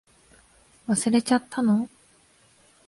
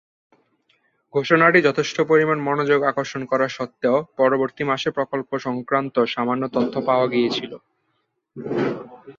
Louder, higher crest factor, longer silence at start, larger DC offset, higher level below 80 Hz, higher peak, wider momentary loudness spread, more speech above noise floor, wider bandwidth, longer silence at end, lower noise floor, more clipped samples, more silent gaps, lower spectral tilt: second, -24 LUFS vs -21 LUFS; about the same, 18 dB vs 20 dB; second, 0.9 s vs 1.15 s; neither; about the same, -66 dBFS vs -64 dBFS; second, -8 dBFS vs -2 dBFS; about the same, 12 LU vs 10 LU; second, 37 dB vs 51 dB; first, 11.5 kHz vs 7.6 kHz; first, 1 s vs 0.05 s; second, -59 dBFS vs -72 dBFS; neither; neither; about the same, -4.5 dB/octave vs -5.5 dB/octave